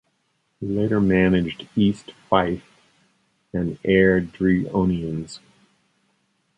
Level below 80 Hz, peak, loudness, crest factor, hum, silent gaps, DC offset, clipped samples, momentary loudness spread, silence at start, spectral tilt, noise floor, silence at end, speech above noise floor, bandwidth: -46 dBFS; -2 dBFS; -21 LUFS; 20 dB; none; none; under 0.1%; under 0.1%; 15 LU; 0.6 s; -7.5 dB/octave; -70 dBFS; 1.2 s; 49 dB; 9 kHz